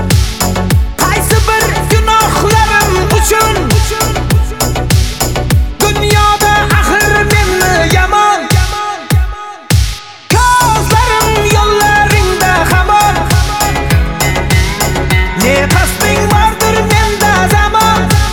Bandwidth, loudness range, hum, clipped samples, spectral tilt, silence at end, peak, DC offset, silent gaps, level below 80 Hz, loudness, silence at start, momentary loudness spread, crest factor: 19.5 kHz; 2 LU; none; under 0.1%; -4 dB/octave; 0 s; 0 dBFS; under 0.1%; none; -16 dBFS; -10 LUFS; 0 s; 5 LU; 10 dB